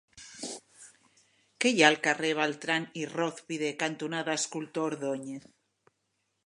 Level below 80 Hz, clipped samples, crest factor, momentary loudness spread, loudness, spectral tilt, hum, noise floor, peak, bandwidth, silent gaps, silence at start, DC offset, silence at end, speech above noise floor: -80 dBFS; under 0.1%; 28 dB; 18 LU; -29 LUFS; -3 dB/octave; none; -79 dBFS; -4 dBFS; 11.5 kHz; none; 0.15 s; under 0.1%; 1.1 s; 49 dB